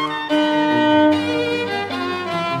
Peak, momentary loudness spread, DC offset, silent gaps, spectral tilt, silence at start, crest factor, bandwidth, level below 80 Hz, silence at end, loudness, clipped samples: -4 dBFS; 8 LU; under 0.1%; none; -5.5 dB/octave; 0 s; 14 dB; 11.5 kHz; -62 dBFS; 0 s; -18 LUFS; under 0.1%